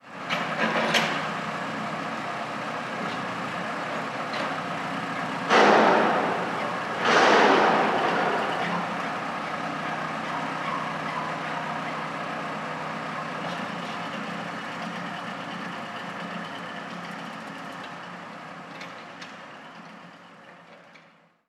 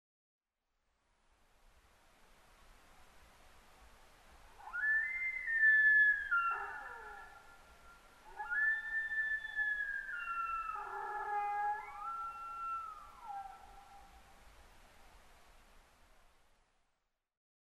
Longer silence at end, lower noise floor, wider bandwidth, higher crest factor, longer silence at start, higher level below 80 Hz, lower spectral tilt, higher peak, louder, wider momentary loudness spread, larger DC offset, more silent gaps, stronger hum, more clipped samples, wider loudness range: second, 0.5 s vs 2.25 s; second, -57 dBFS vs -84 dBFS; first, 15 kHz vs 13 kHz; about the same, 22 dB vs 18 dB; second, 0.05 s vs 2.7 s; second, -76 dBFS vs -66 dBFS; first, -4 dB/octave vs -2 dB/octave; first, -6 dBFS vs -22 dBFS; first, -26 LUFS vs -34 LUFS; second, 19 LU vs 22 LU; neither; neither; neither; neither; about the same, 16 LU vs 17 LU